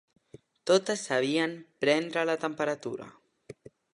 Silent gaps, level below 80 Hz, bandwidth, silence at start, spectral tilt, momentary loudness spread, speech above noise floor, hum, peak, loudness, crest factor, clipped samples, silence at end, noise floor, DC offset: none; -78 dBFS; 11.5 kHz; 0.65 s; -4 dB/octave; 13 LU; 28 dB; none; -10 dBFS; -29 LUFS; 20 dB; under 0.1%; 0.45 s; -56 dBFS; under 0.1%